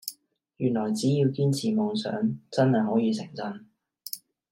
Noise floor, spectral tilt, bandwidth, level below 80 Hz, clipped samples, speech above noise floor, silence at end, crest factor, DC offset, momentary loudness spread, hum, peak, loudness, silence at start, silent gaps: -57 dBFS; -6.5 dB/octave; 16.5 kHz; -70 dBFS; under 0.1%; 32 dB; 0.35 s; 16 dB; under 0.1%; 14 LU; none; -10 dBFS; -26 LUFS; 0.05 s; none